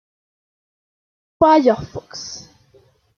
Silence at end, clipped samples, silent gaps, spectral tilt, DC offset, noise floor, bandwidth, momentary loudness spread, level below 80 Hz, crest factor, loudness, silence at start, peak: 0.8 s; under 0.1%; none; -5 dB/octave; under 0.1%; -55 dBFS; 7.2 kHz; 19 LU; -54 dBFS; 20 dB; -15 LUFS; 1.4 s; -2 dBFS